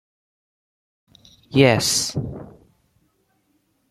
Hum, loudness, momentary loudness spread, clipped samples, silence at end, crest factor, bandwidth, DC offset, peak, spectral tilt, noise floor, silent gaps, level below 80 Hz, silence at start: none; -19 LUFS; 18 LU; under 0.1%; 1.4 s; 24 dB; 15.5 kHz; under 0.1%; -2 dBFS; -4 dB/octave; -67 dBFS; none; -52 dBFS; 1.5 s